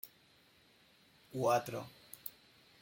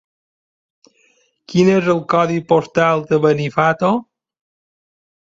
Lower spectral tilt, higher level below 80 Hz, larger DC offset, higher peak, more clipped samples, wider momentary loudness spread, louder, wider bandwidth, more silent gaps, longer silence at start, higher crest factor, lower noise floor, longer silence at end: second, -5 dB/octave vs -7 dB/octave; second, -80 dBFS vs -58 dBFS; neither; second, -20 dBFS vs -2 dBFS; neither; first, 18 LU vs 4 LU; second, -38 LUFS vs -16 LUFS; first, 16.5 kHz vs 7.8 kHz; neither; second, 0.05 s vs 1.5 s; first, 22 dB vs 16 dB; first, -67 dBFS vs -59 dBFS; second, 0.5 s vs 1.3 s